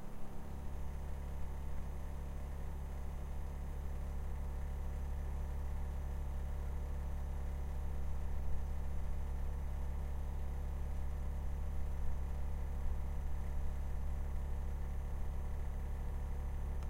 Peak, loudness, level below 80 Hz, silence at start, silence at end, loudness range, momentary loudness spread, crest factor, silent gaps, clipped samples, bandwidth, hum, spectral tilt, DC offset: -24 dBFS; -44 LUFS; -40 dBFS; 0 s; 0 s; 3 LU; 3 LU; 14 dB; none; under 0.1%; 15.5 kHz; none; -7.5 dB/octave; under 0.1%